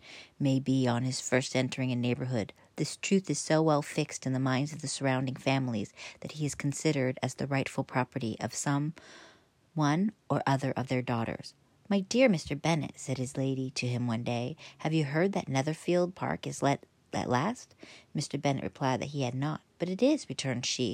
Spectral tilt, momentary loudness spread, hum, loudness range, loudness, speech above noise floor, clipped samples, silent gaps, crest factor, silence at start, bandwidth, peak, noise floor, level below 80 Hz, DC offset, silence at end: -5.5 dB/octave; 9 LU; none; 3 LU; -31 LUFS; 31 dB; under 0.1%; none; 18 dB; 0.05 s; 15.5 kHz; -12 dBFS; -61 dBFS; -68 dBFS; under 0.1%; 0 s